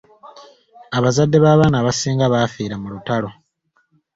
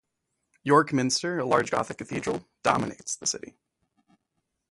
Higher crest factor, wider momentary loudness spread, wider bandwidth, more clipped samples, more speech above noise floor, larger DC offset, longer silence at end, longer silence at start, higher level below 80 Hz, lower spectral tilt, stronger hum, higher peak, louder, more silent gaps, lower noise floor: second, 16 dB vs 22 dB; first, 14 LU vs 11 LU; second, 7.8 kHz vs 11.5 kHz; neither; second, 49 dB vs 54 dB; neither; second, 0.85 s vs 1.35 s; second, 0.25 s vs 0.65 s; first, -48 dBFS vs -62 dBFS; first, -6 dB/octave vs -4 dB/octave; neither; first, -2 dBFS vs -6 dBFS; first, -17 LUFS vs -26 LUFS; neither; second, -65 dBFS vs -80 dBFS